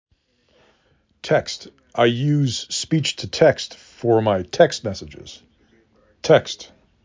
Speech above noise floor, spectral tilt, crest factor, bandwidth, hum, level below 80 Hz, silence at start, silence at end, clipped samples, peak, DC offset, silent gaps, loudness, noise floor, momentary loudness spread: 43 dB; -5 dB/octave; 20 dB; 7.6 kHz; none; -52 dBFS; 1.25 s; 0.4 s; under 0.1%; -2 dBFS; under 0.1%; none; -20 LUFS; -63 dBFS; 16 LU